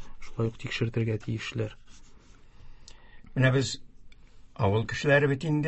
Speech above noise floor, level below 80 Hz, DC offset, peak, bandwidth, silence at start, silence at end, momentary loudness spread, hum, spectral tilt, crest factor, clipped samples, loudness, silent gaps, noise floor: 24 dB; -50 dBFS; under 0.1%; -8 dBFS; 8.4 kHz; 0 s; 0 s; 13 LU; none; -6 dB/octave; 20 dB; under 0.1%; -28 LUFS; none; -51 dBFS